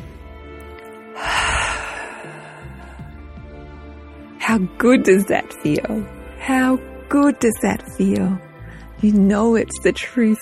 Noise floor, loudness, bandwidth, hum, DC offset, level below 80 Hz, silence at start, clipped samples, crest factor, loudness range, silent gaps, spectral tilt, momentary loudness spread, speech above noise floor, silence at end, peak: -38 dBFS; -18 LUFS; 13.5 kHz; none; under 0.1%; -40 dBFS; 0 s; under 0.1%; 18 dB; 7 LU; none; -5.5 dB/octave; 23 LU; 21 dB; 0 s; -2 dBFS